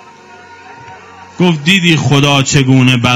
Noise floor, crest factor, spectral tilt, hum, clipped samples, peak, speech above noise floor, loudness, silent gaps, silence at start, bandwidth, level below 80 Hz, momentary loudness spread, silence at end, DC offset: -36 dBFS; 12 dB; -4.5 dB/octave; none; 0.5%; 0 dBFS; 27 dB; -9 LUFS; none; 0.5 s; 15 kHz; -44 dBFS; 4 LU; 0 s; under 0.1%